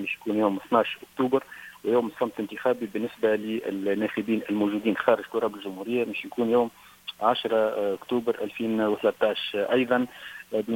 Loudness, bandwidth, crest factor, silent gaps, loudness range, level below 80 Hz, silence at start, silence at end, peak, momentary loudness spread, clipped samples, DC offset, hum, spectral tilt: -27 LUFS; 17 kHz; 20 dB; none; 1 LU; -68 dBFS; 0 s; 0 s; -6 dBFS; 7 LU; under 0.1%; under 0.1%; none; -6 dB/octave